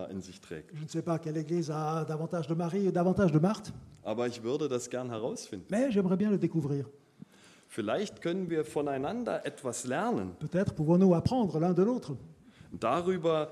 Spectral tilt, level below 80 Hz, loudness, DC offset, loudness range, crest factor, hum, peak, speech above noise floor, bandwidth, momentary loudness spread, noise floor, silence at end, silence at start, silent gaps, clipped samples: -7 dB/octave; -62 dBFS; -31 LUFS; under 0.1%; 5 LU; 18 dB; none; -14 dBFS; 25 dB; 13 kHz; 15 LU; -55 dBFS; 0 s; 0 s; none; under 0.1%